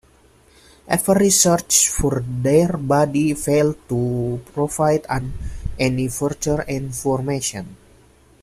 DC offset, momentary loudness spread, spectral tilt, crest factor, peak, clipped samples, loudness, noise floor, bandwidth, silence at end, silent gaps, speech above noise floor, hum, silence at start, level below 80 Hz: under 0.1%; 11 LU; -4.5 dB/octave; 18 dB; -2 dBFS; under 0.1%; -19 LUFS; -53 dBFS; 15 kHz; 0.65 s; none; 34 dB; none; 0.85 s; -38 dBFS